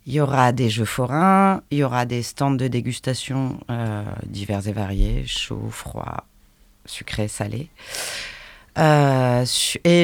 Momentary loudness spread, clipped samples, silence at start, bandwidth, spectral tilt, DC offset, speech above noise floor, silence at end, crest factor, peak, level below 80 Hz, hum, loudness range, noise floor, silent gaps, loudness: 15 LU; under 0.1%; 0.05 s; 18.5 kHz; -5 dB/octave; under 0.1%; 33 dB; 0 s; 18 dB; -4 dBFS; -36 dBFS; none; 9 LU; -54 dBFS; none; -21 LUFS